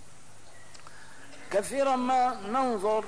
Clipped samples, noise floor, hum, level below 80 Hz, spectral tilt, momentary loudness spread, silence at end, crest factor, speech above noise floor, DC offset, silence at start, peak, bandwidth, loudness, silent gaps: under 0.1%; -54 dBFS; none; -64 dBFS; -4 dB/octave; 24 LU; 0 s; 14 dB; 27 dB; 0.8%; 0.55 s; -16 dBFS; 11 kHz; -28 LUFS; none